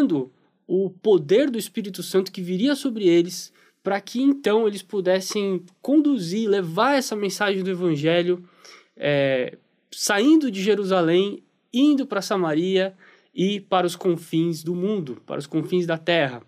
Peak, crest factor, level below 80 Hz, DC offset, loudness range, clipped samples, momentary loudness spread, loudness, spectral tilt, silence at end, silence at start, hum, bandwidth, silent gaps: -6 dBFS; 16 dB; -78 dBFS; under 0.1%; 3 LU; under 0.1%; 10 LU; -22 LUFS; -5 dB/octave; 0.1 s; 0 s; none; 15.5 kHz; none